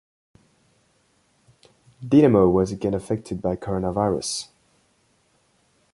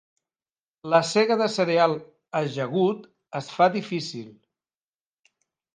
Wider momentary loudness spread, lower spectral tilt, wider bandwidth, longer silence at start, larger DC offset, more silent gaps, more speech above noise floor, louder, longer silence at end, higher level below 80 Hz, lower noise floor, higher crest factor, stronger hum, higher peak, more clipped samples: about the same, 13 LU vs 14 LU; first, -6.5 dB/octave vs -5 dB/octave; first, 11.5 kHz vs 10 kHz; first, 2 s vs 0.85 s; neither; neither; second, 44 dB vs over 67 dB; about the same, -22 LUFS vs -24 LUFS; about the same, 1.5 s vs 1.45 s; first, -48 dBFS vs -76 dBFS; second, -64 dBFS vs under -90 dBFS; about the same, 20 dB vs 20 dB; neither; about the same, -4 dBFS vs -6 dBFS; neither